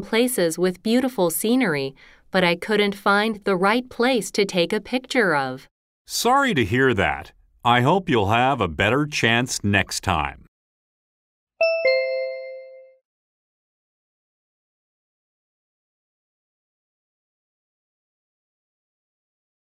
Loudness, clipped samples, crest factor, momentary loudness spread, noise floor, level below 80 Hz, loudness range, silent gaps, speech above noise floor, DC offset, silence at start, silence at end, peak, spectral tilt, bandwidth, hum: -21 LUFS; under 0.1%; 20 dB; 8 LU; -41 dBFS; -50 dBFS; 7 LU; 5.71-6.05 s, 10.48-11.47 s; 21 dB; under 0.1%; 0 s; 6.9 s; -4 dBFS; -4.5 dB/octave; 16 kHz; none